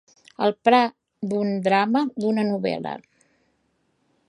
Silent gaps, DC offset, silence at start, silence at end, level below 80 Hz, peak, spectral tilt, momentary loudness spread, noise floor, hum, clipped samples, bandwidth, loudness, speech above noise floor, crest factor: none; under 0.1%; 0.4 s; 1.3 s; -72 dBFS; -4 dBFS; -6.5 dB/octave; 13 LU; -69 dBFS; none; under 0.1%; 11 kHz; -22 LUFS; 48 dB; 20 dB